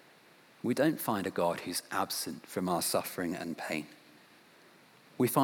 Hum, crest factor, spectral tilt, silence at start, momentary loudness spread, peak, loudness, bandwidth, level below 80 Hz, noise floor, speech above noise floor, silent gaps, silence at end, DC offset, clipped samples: none; 20 dB; -4 dB/octave; 0.65 s; 8 LU; -14 dBFS; -33 LUFS; over 20 kHz; -80 dBFS; -60 dBFS; 27 dB; none; 0 s; under 0.1%; under 0.1%